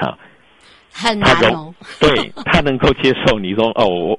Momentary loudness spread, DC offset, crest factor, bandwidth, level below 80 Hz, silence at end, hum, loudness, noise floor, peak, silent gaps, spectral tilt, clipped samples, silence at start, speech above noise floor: 11 LU; under 0.1%; 16 dB; 11.5 kHz; -34 dBFS; 0 s; none; -15 LUFS; -48 dBFS; 0 dBFS; none; -5 dB/octave; under 0.1%; 0 s; 33 dB